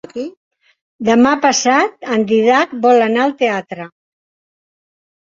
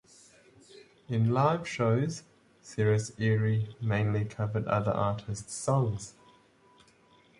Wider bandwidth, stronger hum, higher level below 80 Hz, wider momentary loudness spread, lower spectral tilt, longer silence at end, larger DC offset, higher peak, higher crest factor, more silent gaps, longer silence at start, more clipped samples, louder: second, 7.8 kHz vs 11.5 kHz; neither; about the same, -60 dBFS vs -58 dBFS; first, 17 LU vs 10 LU; second, -3.5 dB/octave vs -6.5 dB/octave; first, 1.45 s vs 1.3 s; neither; first, -2 dBFS vs -12 dBFS; about the same, 14 dB vs 18 dB; first, 0.37-0.51 s, 0.81-0.99 s vs none; second, 0.15 s vs 1.1 s; neither; first, -14 LUFS vs -30 LUFS